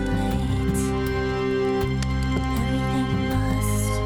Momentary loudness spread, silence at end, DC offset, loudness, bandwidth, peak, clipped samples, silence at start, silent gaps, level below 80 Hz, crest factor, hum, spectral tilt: 1 LU; 0 s; under 0.1%; -24 LUFS; 19 kHz; -10 dBFS; under 0.1%; 0 s; none; -30 dBFS; 12 dB; none; -6 dB/octave